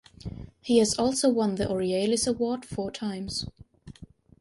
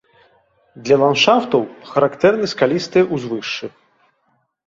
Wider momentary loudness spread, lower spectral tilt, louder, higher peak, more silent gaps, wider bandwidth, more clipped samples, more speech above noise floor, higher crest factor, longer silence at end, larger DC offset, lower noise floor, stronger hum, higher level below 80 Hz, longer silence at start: first, 18 LU vs 12 LU; about the same, -4.5 dB/octave vs -5 dB/octave; second, -26 LUFS vs -17 LUFS; second, -8 dBFS vs -2 dBFS; neither; first, 11.5 kHz vs 7.6 kHz; neither; second, 23 dB vs 49 dB; about the same, 20 dB vs 18 dB; second, 0.35 s vs 1 s; neither; second, -49 dBFS vs -65 dBFS; neither; first, -52 dBFS vs -60 dBFS; second, 0.25 s vs 0.75 s